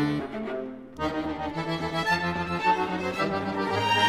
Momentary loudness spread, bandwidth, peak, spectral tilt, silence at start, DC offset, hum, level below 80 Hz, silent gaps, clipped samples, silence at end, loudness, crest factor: 8 LU; 16 kHz; -10 dBFS; -5 dB/octave; 0 s; under 0.1%; none; -52 dBFS; none; under 0.1%; 0 s; -28 LUFS; 18 dB